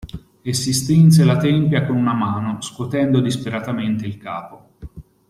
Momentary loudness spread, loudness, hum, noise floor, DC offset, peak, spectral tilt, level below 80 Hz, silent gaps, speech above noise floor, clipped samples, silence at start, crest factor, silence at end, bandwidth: 17 LU; -18 LUFS; none; -38 dBFS; under 0.1%; -2 dBFS; -6 dB/octave; -48 dBFS; none; 21 dB; under 0.1%; 0 s; 16 dB; 0.3 s; 13.5 kHz